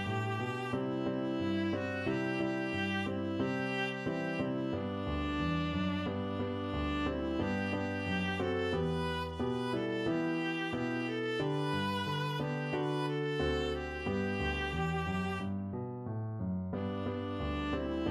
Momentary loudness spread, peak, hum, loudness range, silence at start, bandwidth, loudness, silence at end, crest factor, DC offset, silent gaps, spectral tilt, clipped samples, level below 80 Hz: 3 LU; -22 dBFS; none; 2 LU; 0 s; 13 kHz; -35 LUFS; 0 s; 14 dB; under 0.1%; none; -7 dB/octave; under 0.1%; -50 dBFS